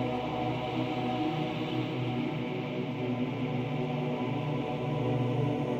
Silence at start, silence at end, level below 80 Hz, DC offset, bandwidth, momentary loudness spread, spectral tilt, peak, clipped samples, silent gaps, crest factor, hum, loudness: 0 s; 0 s; -60 dBFS; under 0.1%; 8 kHz; 3 LU; -8 dB/octave; -18 dBFS; under 0.1%; none; 12 dB; none; -32 LUFS